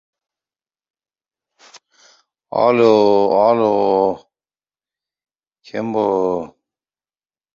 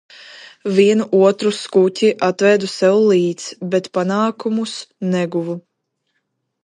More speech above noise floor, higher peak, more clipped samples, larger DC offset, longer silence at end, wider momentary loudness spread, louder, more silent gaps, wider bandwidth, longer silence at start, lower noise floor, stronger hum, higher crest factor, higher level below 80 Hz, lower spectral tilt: first, over 75 dB vs 56 dB; about the same, -2 dBFS vs 0 dBFS; neither; neither; about the same, 1.1 s vs 1.05 s; about the same, 14 LU vs 12 LU; about the same, -16 LUFS vs -17 LUFS; neither; second, 7.4 kHz vs 11.5 kHz; first, 1.75 s vs 0.2 s; first, under -90 dBFS vs -72 dBFS; neither; about the same, 18 dB vs 16 dB; first, -62 dBFS vs -70 dBFS; first, -7 dB/octave vs -5.5 dB/octave